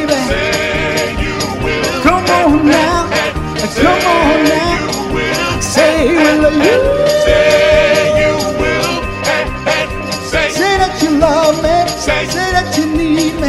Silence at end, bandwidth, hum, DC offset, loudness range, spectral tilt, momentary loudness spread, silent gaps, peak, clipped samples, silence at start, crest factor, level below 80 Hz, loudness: 0 s; 15 kHz; none; under 0.1%; 3 LU; -4 dB/octave; 6 LU; none; 0 dBFS; under 0.1%; 0 s; 12 dB; -26 dBFS; -12 LUFS